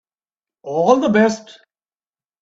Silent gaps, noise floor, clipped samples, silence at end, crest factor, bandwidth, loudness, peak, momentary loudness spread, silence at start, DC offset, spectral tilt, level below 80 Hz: none; under -90 dBFS; under 0.1%; 1 s; 20 dB; 7.8 kHz; -16 LUFS; 0 dBFS; 16 LU; 0.65 s; under 0.1%; -5.5 dB/octave; -62 dBFS